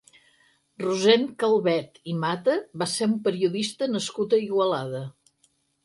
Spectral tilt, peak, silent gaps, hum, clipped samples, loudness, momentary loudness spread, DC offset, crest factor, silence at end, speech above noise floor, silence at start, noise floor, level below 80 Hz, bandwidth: -4.5 dB/octave; -6 dBFS; none; none; under 0.1%; -25 LUFS; 10 LU; under 0.1%; 20 dB; 0.75 s; 43 dB; 0.8 s; -67 dBFS; -72 dBFS; 11.5 kHz